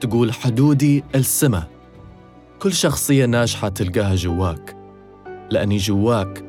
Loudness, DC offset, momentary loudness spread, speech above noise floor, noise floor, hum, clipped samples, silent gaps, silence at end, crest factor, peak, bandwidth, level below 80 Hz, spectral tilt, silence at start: -18 LUFS; under 0.1%; 10 LU; 26 dB; -44 dBFS; none; under 0.1%; none; 0 s; 16 dB; -4 dBFS; 18.5 kHz; -42 dBFS; -5.5 dB/octave; 0 s